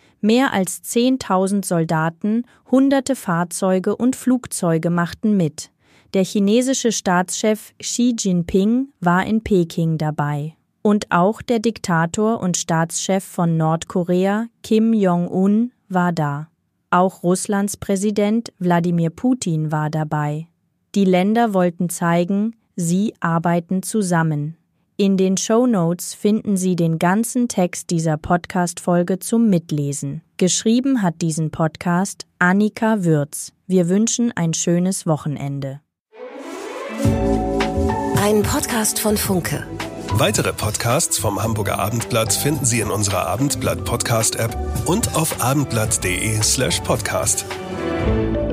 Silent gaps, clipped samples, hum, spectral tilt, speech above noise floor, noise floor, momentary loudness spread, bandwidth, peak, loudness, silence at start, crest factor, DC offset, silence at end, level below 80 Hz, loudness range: 36.00-36.05 s; under 0.1%; none; -5 dB/octave; 20 dB; -39 dBFS; 7 LU; 15.5 kHz; -2 dBFS; -19 LUFS; 0.25 s; 16 dB; under 0.1%; 0 s; -40 dBFS; 2 LU